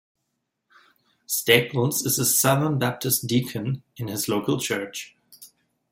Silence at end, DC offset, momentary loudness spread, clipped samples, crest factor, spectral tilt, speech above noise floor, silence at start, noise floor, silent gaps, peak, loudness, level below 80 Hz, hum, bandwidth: 0.45 s; under 0.1%; 13 LU; under 0.1%; 22 dB; -3.5 dB/octave; 55 dB; 1.3 s; -78 dBFS; none; -2 dBFS; -23 LUFS; -62 dBFS; none; 16.5 kHz